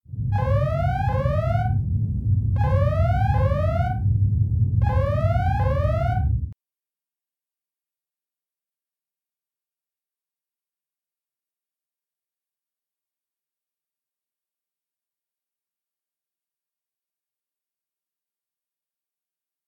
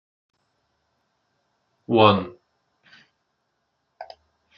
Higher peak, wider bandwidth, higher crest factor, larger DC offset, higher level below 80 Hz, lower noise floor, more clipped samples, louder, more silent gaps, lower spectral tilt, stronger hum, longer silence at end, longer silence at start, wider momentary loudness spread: second, -8 dBFS vs -2 dBFS; second, 5.2 kHz vs 5.8 kHz; second, 16 dB vs 24 dB; neither; first, -34 dBFS vs -68 dBFS; first, under -90 dBFS vs -75 dBFS; neither; second, -22 LUFS vs -19 LUFS; neither; first, -9.5 dB/octave vs -4 dB/octave; neither; first, 13.15 s vs 0.55 s; second, 0.1 s vs 1.9 s; second, 4 LU vs 27 LU